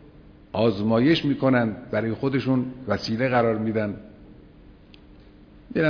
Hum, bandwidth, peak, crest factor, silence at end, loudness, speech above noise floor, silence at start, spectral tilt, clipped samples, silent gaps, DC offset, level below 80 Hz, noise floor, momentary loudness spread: none; 5.4 kHz; -6 dBFS; 18 dB; 0 s; -23 LUFS; 26 dB; 0.55 s; -7.5 dB/octave; under 0.1%; none; under 0.1%; -52 dBFS; -49 dBFS; 8 LU